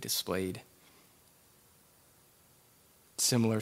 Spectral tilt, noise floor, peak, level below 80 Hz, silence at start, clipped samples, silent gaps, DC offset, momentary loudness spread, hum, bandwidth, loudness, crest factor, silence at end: -3.5 dB/octave; -64 dBFS; -16 dBFS; -76 dBFS; 0 s; under 0.1%; none; under 0.1%; 18 LU; none; 16 kHz; -31 LUFS; 22 dB; 0 s